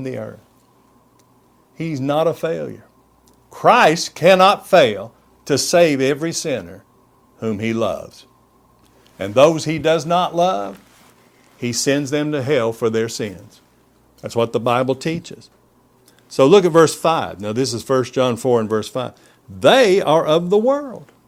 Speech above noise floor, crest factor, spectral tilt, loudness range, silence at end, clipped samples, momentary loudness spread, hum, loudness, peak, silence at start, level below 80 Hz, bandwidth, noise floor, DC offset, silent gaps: 38 dB; 18 dB; -4.5 dB/octave; 8 LU; 0.25 s; under 0.1%; 16 LU; none; -17 LUFS; 0 dBFS; 0 s; -58 dBFS; 16 kHz; -55 dBFS; under 0.1%; none